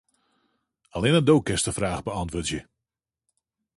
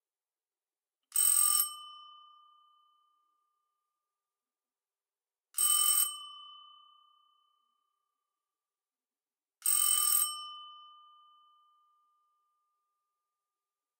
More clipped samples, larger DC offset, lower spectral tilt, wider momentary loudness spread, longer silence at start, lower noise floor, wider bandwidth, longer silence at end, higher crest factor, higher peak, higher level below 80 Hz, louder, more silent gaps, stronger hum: neither; neither; first, -5 dB/octave vs 9.5 dB/octave; second, 12 LU vs 23 LU; second, 0.95 s vs 1.15 s; about the same, -88 dBFS vs under -90 dBFS; second, 11.5 kHz vs 16 kHz; second, 1.15 s vs 3.2 s; about the same, 20 dB vs 22 dB; first, -6 dBFS vs -14 dBFS; first, -46 dBFS vs under -90 dBFS; first, -24 LUFS vs -27 LUFS; neither; neither